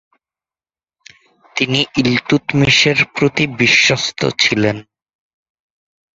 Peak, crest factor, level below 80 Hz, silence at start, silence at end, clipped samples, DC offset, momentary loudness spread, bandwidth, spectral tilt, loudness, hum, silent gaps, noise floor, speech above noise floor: 0 dBFS; 18 dB; -48 dBFS; 1.55 s; 1.35 s; under 0.1%; under 0.1%; 8 LU; 8 kHz; -4 dB/octave; -13 LUFS; none; none; under -90 dBFS; over 75 dB